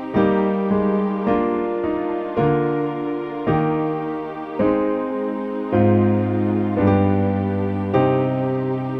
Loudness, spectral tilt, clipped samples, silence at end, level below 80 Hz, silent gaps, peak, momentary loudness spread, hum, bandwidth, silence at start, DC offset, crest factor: -20 LUFS; -10.5 dB/octave; under 0.1%; 0 s; -48 dBFS; none; -4 dBFS; 7 LU; none; 5 kHz; 0 s; under 0.1%; 16 dB